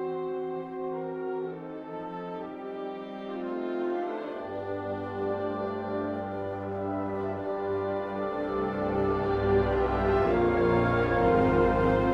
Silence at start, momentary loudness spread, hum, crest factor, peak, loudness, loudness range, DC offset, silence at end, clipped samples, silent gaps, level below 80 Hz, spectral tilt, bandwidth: 0 s; 13 LU; none; 18 dB; -12 dBFS; -29 LUFS; 10 LU; under 0.1%; 0 s; under 0.1%; none; -44 dBFS; -9 dB/octave; 6.6 kHz